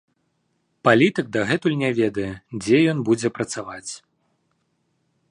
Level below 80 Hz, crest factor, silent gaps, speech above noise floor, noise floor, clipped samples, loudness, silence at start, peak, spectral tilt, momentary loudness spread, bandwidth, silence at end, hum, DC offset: -58 dBFS; 20 dB; none; 50 dB; -70 dBFS; under 0.1%; -21 LUFS; 0.85 s; -4 dBFS; -5.5 dB/octave; 15 LU; 11 kHz; 1.35 s; none; under 0.1%